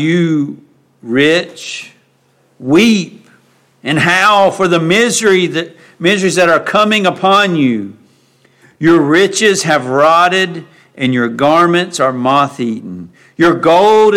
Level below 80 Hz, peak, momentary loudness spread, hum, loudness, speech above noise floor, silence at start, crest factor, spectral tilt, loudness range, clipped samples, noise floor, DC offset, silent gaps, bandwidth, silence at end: -54 dBFS; 0 dBFS; 15 LU; none; -11 LUFS; 43 dB; 0 s; 12 dB; -4.5 dB/octave; 3 LU; under 0.1%; -54 dBFS; under 0.1%; none; 16 kHz; 0 s